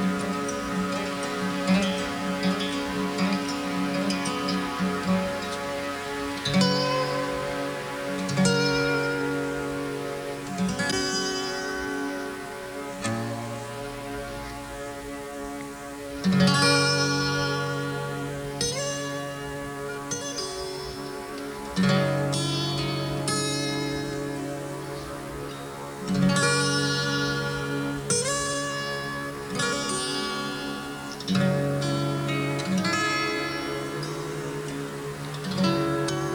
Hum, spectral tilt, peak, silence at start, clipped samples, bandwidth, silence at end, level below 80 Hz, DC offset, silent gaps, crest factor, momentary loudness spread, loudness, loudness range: none; -4.5 dB/octave; -8 dBFS; 0 s; under 0.1%; over 20 kHz; 0 s; -52 dBFS; under 0.1%; none; 18 dB; 12 LU; -27 LUFS; 6 LU